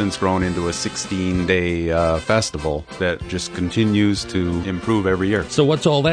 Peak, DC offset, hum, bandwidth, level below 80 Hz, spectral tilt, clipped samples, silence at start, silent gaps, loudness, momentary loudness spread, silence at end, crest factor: -2 dBFS; under 0.1%; none; 10 kHz; -38 dBFS; -5.5 dB/octave; under 0.1%; 0 s; none; -20 LUFS; 6 LU; 0 s; 16 dB